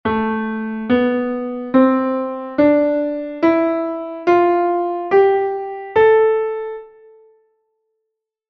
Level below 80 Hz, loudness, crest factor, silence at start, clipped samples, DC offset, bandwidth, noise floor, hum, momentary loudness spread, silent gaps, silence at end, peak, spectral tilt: -54 dBFS; -17 LUFS; 16 dB; 0.05 s; under 0.1%; under 0.1%; 6.2 kHz; -78 dBFS; none; 10 LU; none; 1.65 s; -2 dBFS; -8 dB/octave